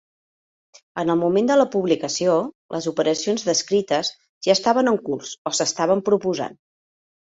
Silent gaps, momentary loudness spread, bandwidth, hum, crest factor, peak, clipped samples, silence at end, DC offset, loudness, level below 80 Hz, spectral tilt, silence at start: 2.55-2.69 s, 4.29-4.41 s, 5.38-5.45 s; 10 LU; 8 kHz; none; 18 dB; -4 dBFS; under 0.1%; 0.85 s; under 0.1%; -21 LUFS; -64 dBFS; -4 dB/octave; 0.95 s